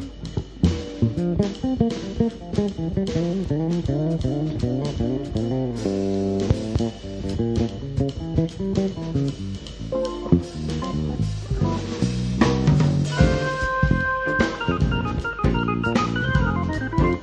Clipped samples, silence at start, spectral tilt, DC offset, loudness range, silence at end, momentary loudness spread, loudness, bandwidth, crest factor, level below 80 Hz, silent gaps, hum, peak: under 0.1%; 0 s; -7 dB/octave; under 0.1%; 4 LU; 0 s; 6 LU; -24 LUFS; 10 kHz; 20 dB; -32 dBFS; none; none; -2 dBFS